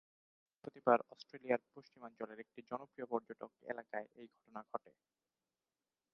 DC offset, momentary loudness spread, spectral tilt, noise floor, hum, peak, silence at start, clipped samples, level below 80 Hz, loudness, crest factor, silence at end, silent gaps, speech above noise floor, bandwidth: under 0.1%; 22 LU; -4.5 dB/octave; under -90 dBFS; none; -16 dBFS; 0.65 s; under 0.1%; under -90 dBFS; -41 LUFS; 28 dB; 1.35 s; none; over 48 dB; 6.4 kHz